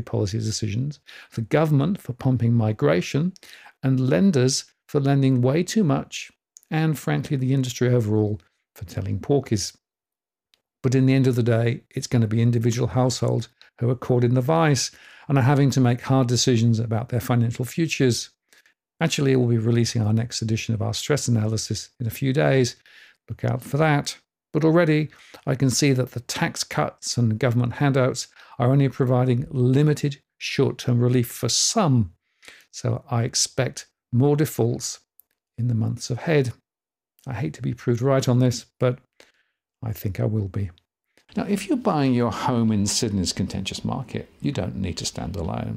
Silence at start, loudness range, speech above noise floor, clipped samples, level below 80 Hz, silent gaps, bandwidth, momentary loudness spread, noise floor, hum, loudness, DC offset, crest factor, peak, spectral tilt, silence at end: 0 s; 4 LU; over 68 dB; under 0.1%; -56 dBFS; none; 16 kHz; 11 LU; under -90 dBFS; none; -23 LUFS; under 0.1%; 16 dB; -6 dBFS; -5.5 dB/octave; 0 s